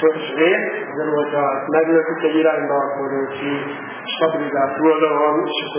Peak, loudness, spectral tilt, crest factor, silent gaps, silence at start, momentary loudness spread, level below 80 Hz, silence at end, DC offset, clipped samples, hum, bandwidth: -2 dBFS; -19 LUFS; -9 dB/octave; 16 dB; none; 0 s; 8 LU; -72 dBFS; 0 s; under 0.1%; under 0.1%; none; 3.6 kHz